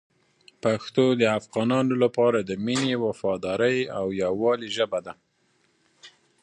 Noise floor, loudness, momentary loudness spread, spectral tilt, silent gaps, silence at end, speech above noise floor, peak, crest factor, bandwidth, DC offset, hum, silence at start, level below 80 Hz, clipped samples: -67 dBFS; -24 LUFS; 7 LU; -5.5 dB/octave; none; 0.35 s; 43 dB; -6 dBFS; 18 dB; 10.5 kHz; under 0.1%; none; 0.65 s; -64 dBFS; under 0.1%